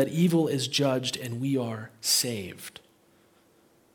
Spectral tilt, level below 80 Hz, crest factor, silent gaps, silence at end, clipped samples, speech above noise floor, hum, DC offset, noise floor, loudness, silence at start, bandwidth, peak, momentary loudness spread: -4 dB/octave; -72 dBFS; 18 dB; none; 1.25 s; under 0.1%; 35 dB; none; under 0.1%; -62 dBFS; -27 LUFS; 0 s; 18 kHz; -10 dBFS; 14 LU